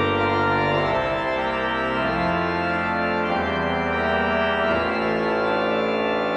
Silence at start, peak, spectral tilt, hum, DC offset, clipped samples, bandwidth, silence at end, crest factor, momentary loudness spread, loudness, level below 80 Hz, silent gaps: 0 s; -10 dBFS; -6.5 dB/octave; none; under 0.1%; under 0.1%; 9.2 kHz; 0 s; 12 dB; 2 LU; -22 LUFS; -44 dBFS; none